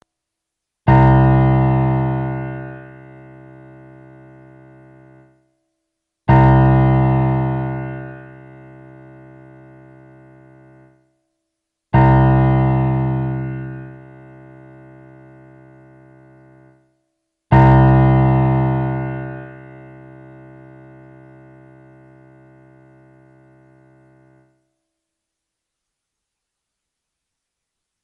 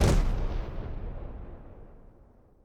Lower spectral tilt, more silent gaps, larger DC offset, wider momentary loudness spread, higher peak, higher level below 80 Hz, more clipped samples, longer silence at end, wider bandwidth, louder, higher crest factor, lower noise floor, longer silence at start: first, -11 dB/octave vs -6 dB/octave; neither; neither; about the same, 23 LU vs 23 LU; first, 0 dBFS vs -12 dBFS; about the same, -32 dBFS vs -32 dBFS; neither; first, 8.45 s vs 0.6 s; second, 3.9 kHz vs 13.5 kHz; first, -15 LUFS vs -34 LUFS; about the same, 18 dB vs 18 dB; first, -81 dBFS vs -57 dBFS; first, 0.85 s vs 0 s